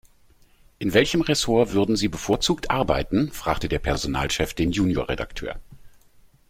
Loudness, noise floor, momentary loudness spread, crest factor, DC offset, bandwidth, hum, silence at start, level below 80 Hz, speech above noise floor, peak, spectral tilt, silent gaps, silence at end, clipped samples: -23 LUFS; -55 dBFS; 9 LU; 22 dB; under 0.1%; 16.5 kHz; none; 0.8 s; -38 dBFS; 33 dB; -2 dBFS; -4.5 dB/octave; none; 0.6 s; under 0.1%